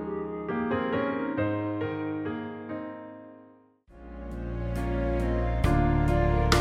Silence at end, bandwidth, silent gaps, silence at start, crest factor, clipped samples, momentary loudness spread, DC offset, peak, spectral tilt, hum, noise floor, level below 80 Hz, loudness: 0 s; 15.5 kHz; none; 0 s; 20 dB; under 0.1%; 16 LU; under 0.1%; -8 dBFS; -6.5 dB/octave; none; -56 dBFS; -34 dBFS; -29 LUFS